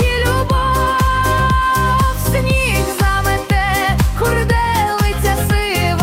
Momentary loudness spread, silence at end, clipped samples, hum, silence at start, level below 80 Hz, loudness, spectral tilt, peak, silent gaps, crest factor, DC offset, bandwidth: 2 LU; 0 s; under 0.1%; none; 0 s; -20 dBFS; -15 LUFS; -5 dB/octave; -4 dBFS; none; 12 dB; under 0.1%; 16.5 kHz